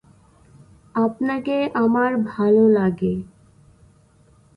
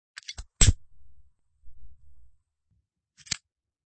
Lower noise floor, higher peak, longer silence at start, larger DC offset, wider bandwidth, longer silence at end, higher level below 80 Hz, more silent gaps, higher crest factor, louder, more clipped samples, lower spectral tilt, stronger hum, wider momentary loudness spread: second, -54 dBFS vs -74 dBFS; about the same, -6 dBFS vs -4 dBFS; first, 0.95 s vs 0.3 s; neither; second, 5.2 kHz vs 8.8 kHz; first, 1.3 s vs 0.55 s; second, -56 dBFS vs -36 dBFS; neither; second, 14 dB vs 26 dB; first, -20 LUFS vs -26 LUFS; neither; first, -9 dB/octave vs -2.5 dB/octave; neither; second, 10 LU vs 19 LU